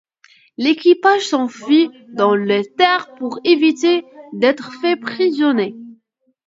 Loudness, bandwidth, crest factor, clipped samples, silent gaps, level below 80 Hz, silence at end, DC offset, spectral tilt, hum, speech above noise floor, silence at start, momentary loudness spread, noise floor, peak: -16 LUFS; 7.8 kHz; 16 dB; under 0.1%; none; -72 dBFS; 0.55 s; under 0.1%; -4.5 dB/octave; none; 48 dB; 0.6 s; 7 LU; -64 dBFS; 0 dBFS